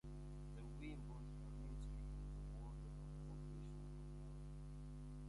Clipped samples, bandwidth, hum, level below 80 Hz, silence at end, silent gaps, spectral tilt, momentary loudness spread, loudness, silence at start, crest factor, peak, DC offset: under 0.1%; 11.5 kHz; 50 Hz at -50 dBFS; -54 dBFS; 0 s; none; -7.5 dB/octave; 3 LU; -54 LUFS; 0.05 s; 10 dB; -42 dBFS; under 0.1%